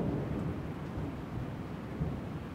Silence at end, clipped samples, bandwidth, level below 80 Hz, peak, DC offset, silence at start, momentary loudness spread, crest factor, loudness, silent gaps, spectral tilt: 0 s; under 0.1%; 16 kHz; -48 dBFS; -22 dBFS; under 0.1%; 0 s; 5 LU; 16 dB; -39 LUFS; none; -8.5 dB/octave